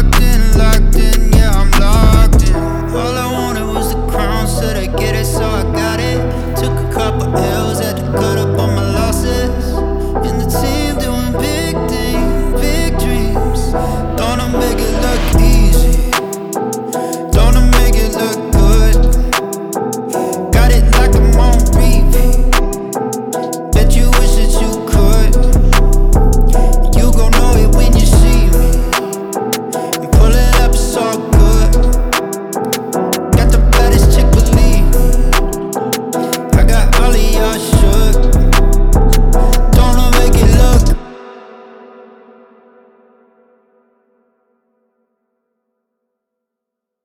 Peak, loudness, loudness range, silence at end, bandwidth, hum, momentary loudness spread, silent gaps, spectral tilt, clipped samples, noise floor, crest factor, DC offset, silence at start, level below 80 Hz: 0 dBFS; -13 LUFS; 4 LU; 5.65 s; 16.5 kHz; none; 7 LU; none; -5.5 dB/octave; under 0.1%; -80 dBFS; 10 dB; under 0.1%; 0 s; -12 dBFS